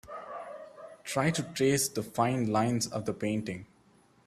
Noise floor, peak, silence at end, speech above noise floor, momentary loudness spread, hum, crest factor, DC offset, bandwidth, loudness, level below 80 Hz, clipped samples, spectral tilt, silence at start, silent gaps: -63 dBFS; -12 dBFS; 0.6 s; 33 dB; 17 LU; none; 20 dB; under 0.1%; 15.5 kHz; -30 LUFS; -64 dBFS; under 0.1%; -4.5 dB/octave; 0.05 s; none